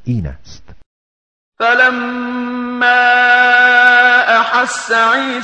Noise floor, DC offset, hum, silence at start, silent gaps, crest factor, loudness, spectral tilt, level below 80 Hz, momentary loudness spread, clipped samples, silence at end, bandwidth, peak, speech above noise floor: under -90 dBFS; under 0.1%; none; 0.05 s; 0.86-1.52 s; 12 dB; -10 LUFS; -3.5 dB/octave; -42 dBFS; 13 LU; under 0.1%; 0 s; 9.8 kHz; 0 dBFS; over 77 dB